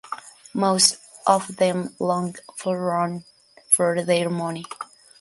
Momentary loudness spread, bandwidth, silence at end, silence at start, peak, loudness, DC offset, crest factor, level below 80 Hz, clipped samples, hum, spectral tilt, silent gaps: 18 LU; 12 kHz; 0.35 s; 0.05 s; -2 dBFS; -22 LUFS; under 0.1%; 22 dB; -68 dBFS; under 0.1%; none; -3.5 dB/octave; none